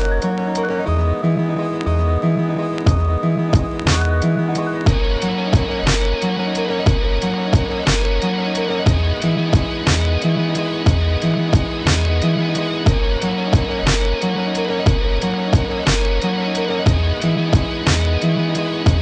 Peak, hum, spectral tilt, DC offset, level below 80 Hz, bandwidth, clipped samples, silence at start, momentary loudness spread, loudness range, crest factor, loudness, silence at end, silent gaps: -4 dBFS; none; -6 dB/octave; under 0.1%; -24 dBFS; 9.8 kHz; under 0.1%; 0 s; 3 LU; 1 LU; 14 dB; -18 LUFS; 0 s; none